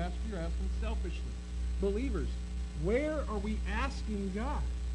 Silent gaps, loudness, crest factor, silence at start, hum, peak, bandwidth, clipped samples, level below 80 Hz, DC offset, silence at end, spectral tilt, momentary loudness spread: none; -36 LUFS; 16 dB; 0 s; none; -18 dBFS; 10 kHz; under 0.1%; -36 dBFS; under 0.1%; 0 s; -7 dB/octave; 7 LU